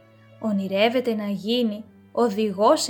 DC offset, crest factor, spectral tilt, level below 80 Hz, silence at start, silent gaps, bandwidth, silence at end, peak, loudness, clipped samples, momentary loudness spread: under 0.1%; 18 dB; -4.5 dB/octave; -76 dBFS; 0.4 s; none; 19 kHz; 0 s; -6 dBFS; -24 LUFS; under 0.1%; 10 LU